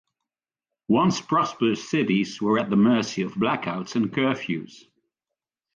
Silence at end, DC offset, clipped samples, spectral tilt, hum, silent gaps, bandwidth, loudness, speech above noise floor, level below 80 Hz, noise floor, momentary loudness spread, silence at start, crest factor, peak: 0.95 s; under 0.1%; under 0.1%; -6 dB/octave; none; none; 7.4 kHz; -24 LUFS; 66 dB; -64 dBFS; -89 dBFS; 8 LU; 0.9 s; 16 dB; -10 dBFS